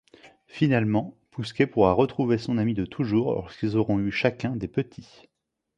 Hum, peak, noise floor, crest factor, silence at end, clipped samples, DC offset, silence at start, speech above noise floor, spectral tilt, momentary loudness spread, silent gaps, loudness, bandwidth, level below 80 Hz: none; -6 dBFS; -54 dBFS; 20 dB; 0.75 s; under 0.1%; under 0.1%; 0.25 s; 29 dB; -8 dB/octave; 11 LU; none; -25 LUFS; 10 kHz; -52 dBFS